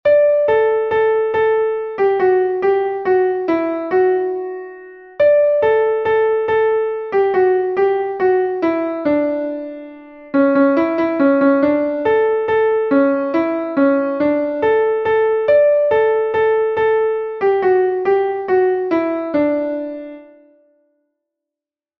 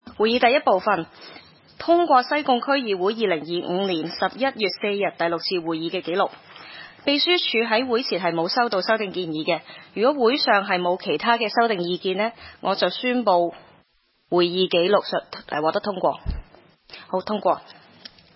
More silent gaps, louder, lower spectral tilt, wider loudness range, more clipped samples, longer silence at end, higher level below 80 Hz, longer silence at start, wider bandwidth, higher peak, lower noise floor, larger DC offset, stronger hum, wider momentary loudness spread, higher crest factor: neither; first, -16 LUFS vs -22 LUFS; about the same, -8 dB/octave vs -8.5 dB/octave; about the same, 3 LU vs 3 LU; neither; first, 1.75 s vs 0.65 s; second, -56 dBFS vs -48 dBFS; about the same, 0.05 s vs 0.05 s; about the same, 5.8 kHz vs 5.8 kHz; about the same, -4 dBFS vs -4 dBFS; first, -88 dBFS vs -64 dBFS; neither; neither; second, 7 LU vs 11 LU; second, 12 dB vs 18 dB